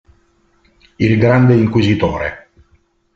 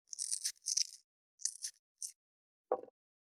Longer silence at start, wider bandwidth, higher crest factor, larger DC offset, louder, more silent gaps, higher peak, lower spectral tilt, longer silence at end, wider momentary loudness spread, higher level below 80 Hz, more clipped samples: first, 1 s vs 0.1 s; second, 7.2 kHz vs 18.5 kHz; second, 14 dB vs 28 dB; neither; first, -14 LUFS vs -39 LUFS; second, none vs 1.04-1.38 s, 1.79-1.95 s, 2.15-2.64 s; first, -2 dBFS vs -16 dBFS; first, -8.5 dB/octave vs 2.5 dB/octave; first, 0.8 s vs 0.4 s; about the same, 10 LU vs 12 LU; first, -42 dBFS vs under -90 dBFS; neither